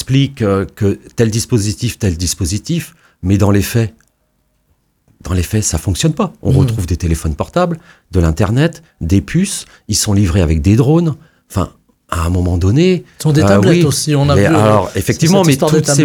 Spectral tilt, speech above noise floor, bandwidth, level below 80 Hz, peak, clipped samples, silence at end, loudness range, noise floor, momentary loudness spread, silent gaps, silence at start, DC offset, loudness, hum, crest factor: -5.5 dB/octave; 48 dB; 18.5 kHz; -30 dBFS; 0 dBFS; under 0.1%; 0 s; 6 LU; -61 dBFS; 10 LU; none; 0 s; under 0.1%; -14 LUFS; none; 14 dB